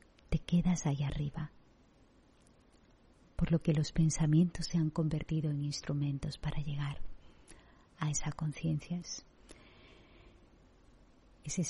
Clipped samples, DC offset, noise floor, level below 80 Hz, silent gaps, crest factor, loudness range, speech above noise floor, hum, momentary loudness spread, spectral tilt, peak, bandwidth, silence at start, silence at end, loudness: under 0.1%; under 0.1%; -64 dBFS; -48 dBFS; none; 18 dB; 8 LU; 31 dB; none; 11 LU; -6 dB/octave; -18 dBFS; 11 kHz; 0.3 s; 0 s; -35 LUFS